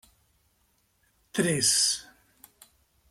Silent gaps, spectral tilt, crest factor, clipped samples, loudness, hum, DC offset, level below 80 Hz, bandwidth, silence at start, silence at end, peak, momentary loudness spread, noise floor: none; -2 dB/octave; 22 dB; under 0.1%; -24 LUFS; none; under 0.1%; -68 dBFS; 16.5 kHz; 1.35 s; 1.1 s; -10 dBFS; 12 LU; -70 dBFS